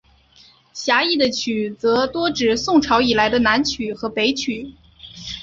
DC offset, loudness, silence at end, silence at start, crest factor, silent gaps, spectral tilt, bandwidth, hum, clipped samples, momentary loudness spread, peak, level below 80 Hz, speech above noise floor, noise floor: under 0.1%; -18 LUFS; 0 s; 0.75 s; 18 dB; none; -3.5 dB/octave; 7.8 kHz; none; under 0.1%; 13 LU; -2 dBFS; -48 dBFS; 33 dB; -51 dBFS